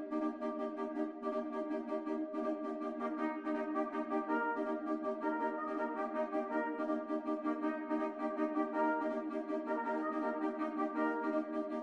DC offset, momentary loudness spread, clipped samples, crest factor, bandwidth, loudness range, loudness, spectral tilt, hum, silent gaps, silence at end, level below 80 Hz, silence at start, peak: under 0.1%; 4 LU; under 0.1%; 14 dB; 6.6 kHz; 2 LU; -38 LUFS; -6.5 dB/octave; none; none; 0 s; -80 dBFS; 0 s; -22 dBFS